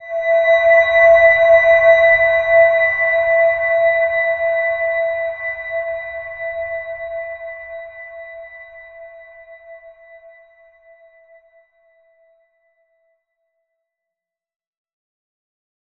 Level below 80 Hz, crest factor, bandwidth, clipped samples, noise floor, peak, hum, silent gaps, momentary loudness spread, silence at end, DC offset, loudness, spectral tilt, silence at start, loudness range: -52 dBFS; 16 dB; 6.4 kHz; under 0.1%; -85 dBFS; -2 dBFS; none; none; 22 LU; 6.1 s; under 0.1%; -14 LUFS; -3 dB/octave; 0 s; 23 LU